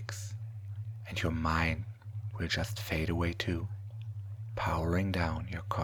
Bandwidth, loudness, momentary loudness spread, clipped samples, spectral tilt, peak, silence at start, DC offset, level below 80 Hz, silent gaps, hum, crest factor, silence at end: 20 kHz; -35 LUFS; 12 LU; under 0.1%; -5.5 dB/octave; -14 dBFS; 0 s; under 0.1%; -46 dBFS; none; none; 20 dB; 0 s